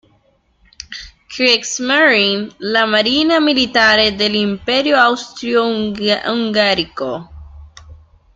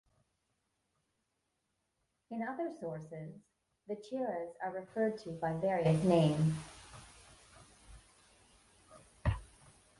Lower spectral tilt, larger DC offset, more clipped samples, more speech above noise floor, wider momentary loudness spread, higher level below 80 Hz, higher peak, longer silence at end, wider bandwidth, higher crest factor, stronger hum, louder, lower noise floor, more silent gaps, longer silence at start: second, -3 dB/octave vs -7.5 dB/octave; neither; neither; second, 43 dB vs 49 dB; second, 13 LU vs 22 LU; first, -46 dBFS vs -54 dBFS; first, 0 dBFS vs -16 dBFS; second, 0.4 s vs 0.55 s; second, 9.2 kHz vs 11.5 kHz; second, 16 dB vs 22 dB; neither; first, -14 LUFS vs -36 LUFS; second, -57 dBFS vs -83 dBFS; neither; second, 0.9 s vs 2.3 s